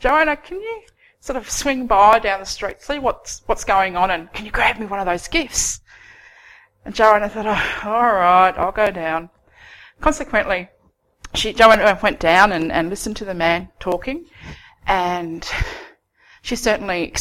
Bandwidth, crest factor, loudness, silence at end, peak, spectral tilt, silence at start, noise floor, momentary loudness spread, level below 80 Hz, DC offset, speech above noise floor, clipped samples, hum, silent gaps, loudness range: 16.5 kHz; 20 dB; -18 LUFS; 0 s; 0 dBFS; -3 dB/octave; 0 s; -53 dBFS; 16 LU; -36 dBFS; under 0.1%; 35 dB; under 0.1%; none; none; 6 LU